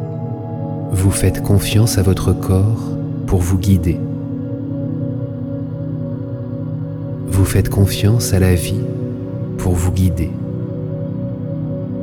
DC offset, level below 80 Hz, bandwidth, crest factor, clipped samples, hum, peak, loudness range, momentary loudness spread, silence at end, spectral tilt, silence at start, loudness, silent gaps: under 0.1%; -32 dBFS; 17.5 kHz; 16 dB; under 0.1%; none; -2 dBFS; 5 LU; 10 LU; 0 s; -6.5 dB/octave; 0 s; -18 LUFS; none